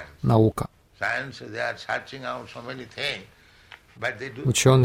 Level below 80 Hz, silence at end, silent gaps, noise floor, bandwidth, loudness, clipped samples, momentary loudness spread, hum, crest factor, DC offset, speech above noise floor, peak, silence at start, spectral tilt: -52 dBFS; 0 s; none; -50 dBFS; 16 kHz; -26 LUFS; under 0.1%; 16 LU; none; 20 dB; under 0.1%; 26 dB; -6 dBFS; 0 s; -5 dB/octave